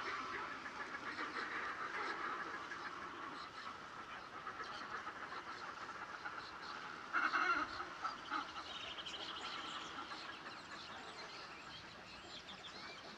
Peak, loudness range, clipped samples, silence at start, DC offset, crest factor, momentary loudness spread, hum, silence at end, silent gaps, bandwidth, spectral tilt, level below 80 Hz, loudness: -24 dBFS; 7 LU; under 0.1%; 0 s; under 0.1%; 22 dB; 10 LU; none; 0 s; none; 13 kHz; -2.5 dB/octave; -76 dBFS; -45 LUFS